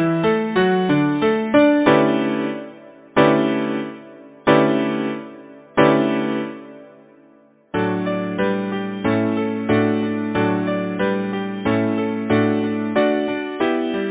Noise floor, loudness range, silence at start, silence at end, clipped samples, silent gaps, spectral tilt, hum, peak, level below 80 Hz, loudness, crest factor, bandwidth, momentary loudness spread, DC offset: -52 dBFS; 5 LU; 0 s; 0 s; under 0.1%; none; -10.5 dB/octave; none; 0 dBFS; -54 dBFS; -19 LUFS; 18 dB; 4 kHz; 10 LU; under 0.1%